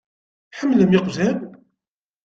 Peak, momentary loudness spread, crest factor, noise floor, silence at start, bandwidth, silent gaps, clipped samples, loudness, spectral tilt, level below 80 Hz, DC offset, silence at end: -4 dBFS; 21 LU; 18 dB; -86 dBFS; 0.55 s; 7.6 kHz; none; under 0.1%; -19 LUFS; -7 dB/octave; -58 dBFS; under 0.1%; 0.75 s